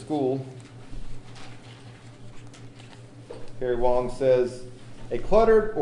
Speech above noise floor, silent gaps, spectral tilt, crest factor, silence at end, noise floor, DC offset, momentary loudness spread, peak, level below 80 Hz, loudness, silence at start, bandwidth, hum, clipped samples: 23 dB; none; -7 dB/octave; 20 dB; 0 s; -45 dBFS; under 0.1%; 25 LU; -6 dBFS; -38 dBFS; -24 LUFS; 0 s; 10.5 kHz; none; under 0.1%